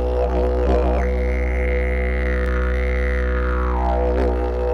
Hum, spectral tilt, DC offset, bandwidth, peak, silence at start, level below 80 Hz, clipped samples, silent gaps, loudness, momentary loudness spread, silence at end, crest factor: none; -8.5 dB/octave; under 0.1%; 6 kHz; -6 dBFS; 0 s; -20 dBFS; under 0.1%; none; -21 LUFS; 3 LU; 0 s; 14 dB